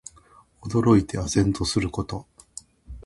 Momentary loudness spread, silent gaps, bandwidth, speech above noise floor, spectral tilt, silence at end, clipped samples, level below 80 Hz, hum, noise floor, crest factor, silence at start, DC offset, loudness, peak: 23 LU; none; 11.5 kHz; 33 dB; -6 dB/octave; 0.05 s; under 0.1%; -42 dBFS; none; -55 dBFS; 18 dB; 0.65 s; under 0.1%; -23 LUFS; -6 dBFS